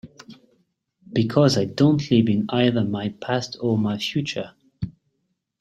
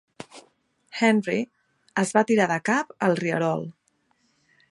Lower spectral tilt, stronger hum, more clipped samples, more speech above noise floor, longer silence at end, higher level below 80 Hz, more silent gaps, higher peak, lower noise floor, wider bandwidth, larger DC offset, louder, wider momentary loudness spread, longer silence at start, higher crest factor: about the same, -6.5 dB/octave vs -5.5 dB/octave; neither; neither; first, 54 dB vs 46 dB; second, 0.7 s vs 1 s; first, -56 dBFS vs -74 dBFS; neither; about the same, -4 dBFS vs -4 dBFS; first, -74 dBFS vs -68 dBFS; about the same, 12.5 kHz vs 11.5 kHz; neither; about the same, -22 LUFS vs -24 LUFS; second, 16 LU vs 19 LU; second, 0.05 s vs 0.35 s; about the same, 18 dB vs 22 dB